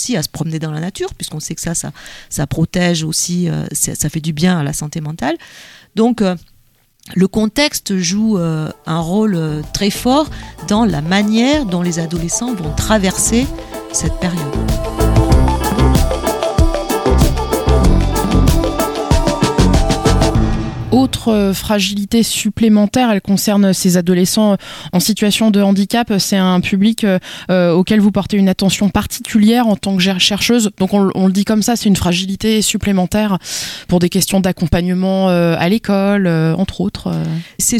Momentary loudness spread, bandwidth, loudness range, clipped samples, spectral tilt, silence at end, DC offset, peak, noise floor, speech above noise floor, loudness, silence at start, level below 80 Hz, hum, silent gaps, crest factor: 8 LU; 17.5 kHz; 4 LU; under 0.1%; -5 dB/octave; 0 s; under 0.1%; 0 dBFS; -52 dBFS; 38 dB; -15 LUFS; 0 s; -24 dBFS; none; none; 14 dB